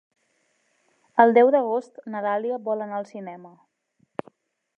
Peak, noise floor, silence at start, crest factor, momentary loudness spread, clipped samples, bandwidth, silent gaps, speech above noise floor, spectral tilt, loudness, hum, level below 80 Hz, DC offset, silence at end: -4 dBFS; -69 dBFS; 1.15 s; 22 dB; 21 LU; under 0.1%; 6.6 kHz; none; 47 dB; -7 dB/octave; -22 LUFS; none; -82 dBFS; under 0.1%; 1.3 s